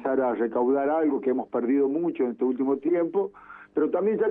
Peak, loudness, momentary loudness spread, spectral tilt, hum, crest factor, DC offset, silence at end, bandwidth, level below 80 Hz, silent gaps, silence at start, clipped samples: -14 dBFS; -25 LUFS; 4 LU; -10.5 dB/octave; none; 12 dB; under 0.1%; 0 s; 3.6 kHz; -70 dBFS; none; 0 s; under 0.1%